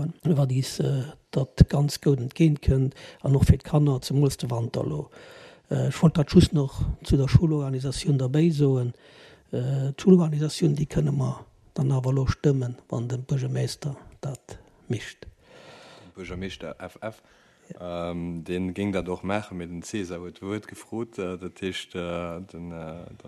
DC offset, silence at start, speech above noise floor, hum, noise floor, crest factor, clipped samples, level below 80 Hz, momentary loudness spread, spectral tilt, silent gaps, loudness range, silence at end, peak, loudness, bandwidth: under 0.1%; 0 s; 25 dB; none; -50 dBFS; 22 dB; under 0.1%; -40 dBFS; 16 LU; -7 dB/octave; none; 13 LU; 0 s; -4 dBFS; -25 LUFS; 13 kHz